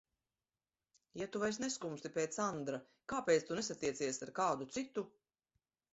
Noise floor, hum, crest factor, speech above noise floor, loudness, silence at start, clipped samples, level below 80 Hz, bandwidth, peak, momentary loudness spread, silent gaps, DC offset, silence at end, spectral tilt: under -90 dBFS; none; 20 dB; over 51 dB; -39 LUFS; 1.15 s; under 0.1%; -76 dBFS; 8 kHz; -20 dBFS; 11 LU; none; under 0.1%; 0.85 s; -3.5 dB/octave